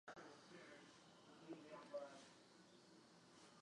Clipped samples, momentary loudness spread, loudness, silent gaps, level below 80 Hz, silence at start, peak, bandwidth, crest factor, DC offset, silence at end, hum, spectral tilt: under 0.1%; 13 LU; -61 LUFS; none; under -90 dBFS; 0.05 s; -40 dBFS; 11 kHz; 20 dB; under 0.1%; 0 s; none; -4 dB/octave